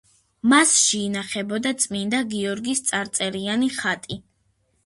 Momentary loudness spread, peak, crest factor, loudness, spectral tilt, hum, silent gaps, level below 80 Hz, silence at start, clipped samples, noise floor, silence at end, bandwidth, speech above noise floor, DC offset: 11 LU; -4 dBFS; 20 dB; -21 LUFS; -2 dB/octave; none; none; -62 dBFS; 0.45 s; under 0.1%; -67 dBFS; 0.65 s; 11.5 kHz; 45 dB; under 0.1%